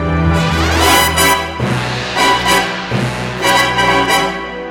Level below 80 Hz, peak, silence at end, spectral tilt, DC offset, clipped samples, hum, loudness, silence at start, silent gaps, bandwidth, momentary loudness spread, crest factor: -28 dBFS; 0 dBFS; 0 s; -3.5 dB/octave; under 0.1%; under 0.1%; none; -13 LUFS; 0 s; none; over 20 kHz; 8 LU; 14 dB